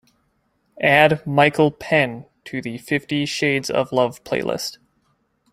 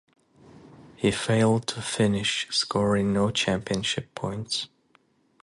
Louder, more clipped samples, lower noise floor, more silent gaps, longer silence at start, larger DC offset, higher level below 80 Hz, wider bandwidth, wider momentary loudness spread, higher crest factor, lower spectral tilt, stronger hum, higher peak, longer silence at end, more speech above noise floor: first, -19 LUFS vs -25 LUFS; neither; about the same, -67 dBFS vs -64 dBFS; neither; first, 0.75 s vs 0.55 s; neither; about the same, -58 dBFS vs -54 dBFS; first, 16 kHz vs 11.5 kHz; first, 14 LU vs 7 LU; about the same, 20 dB vs 16 dB; about the same, -5 dB/octave vs -4.5 dB/octave; neither; first, -2 dBFS vs -10 dBFS; about the same, 0.8 s vs 0.75 s; first, 47 dB vs 39 dB